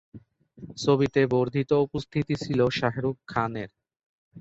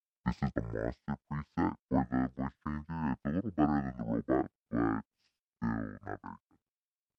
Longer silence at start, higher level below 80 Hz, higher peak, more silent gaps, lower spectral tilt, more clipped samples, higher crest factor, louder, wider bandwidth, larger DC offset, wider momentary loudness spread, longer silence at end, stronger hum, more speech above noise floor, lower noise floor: about the same, 0.15 s vs 0.25 s; about the same, -56 dBFS vs -52 dBFS; first, -8 dBFS vs -14 dBFS; second, 4.06-4.31 s vs 1.82-1.88 s, 4.55-4.65 s, 5.05-5.11 s, 5.44-5.53 s; second, -6.5 dB/octave vs -9.5 dB/octave; neither; about the same, 18 dB vs 20 dB; first, -26 LUFS vs -35 LUFS; first, 8 kHz vs 6.4 kHz; neither; about the same, 9 LU vs 11 LU; second, 0 s vs 0.8 s; neither; second, 25 dB vs over 56 dB; second, -50 dBFS vs under -90 dBFS